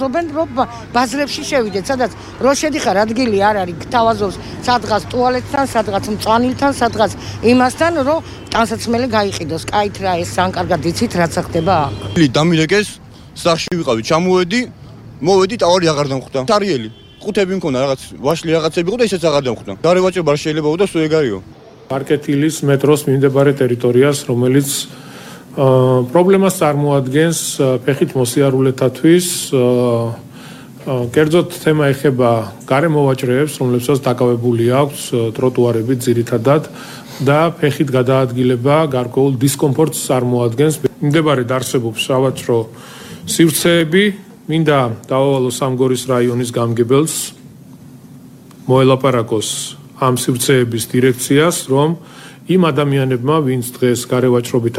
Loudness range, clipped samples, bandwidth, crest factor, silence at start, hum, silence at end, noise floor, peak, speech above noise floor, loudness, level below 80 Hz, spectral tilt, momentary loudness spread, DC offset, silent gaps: 3 LU; under 0.1%; 16 kHz; 14 dB; 0 s; none; 0 s; -38 dBFS; 0 dBFS; 24 dB; -15 LUFS; -44 dBFS; -5.5 dB/octave; 8 LU; under 0.1%; none